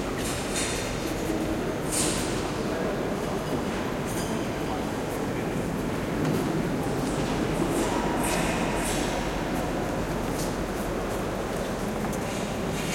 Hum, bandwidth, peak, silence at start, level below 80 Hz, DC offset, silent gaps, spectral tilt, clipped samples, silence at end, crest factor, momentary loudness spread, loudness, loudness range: none; 16.5 kHz; -12 dBFS; 0 s; -40 dBFS; under 0.1%; none; -4.5 dB/octave; under 0.1%; 0 s; 16 dB; 4 LU; -28 LUFS; 3 LU